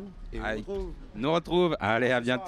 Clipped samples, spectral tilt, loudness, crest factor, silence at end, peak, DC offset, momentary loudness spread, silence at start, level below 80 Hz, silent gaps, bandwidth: under 0.1%; -6 dB/octave; -28 LUFS; 16 dB; 0 s; -12 dBFS; under 0.1%; 12 LU; 0 s; -44 dBFS; none; 12 kHz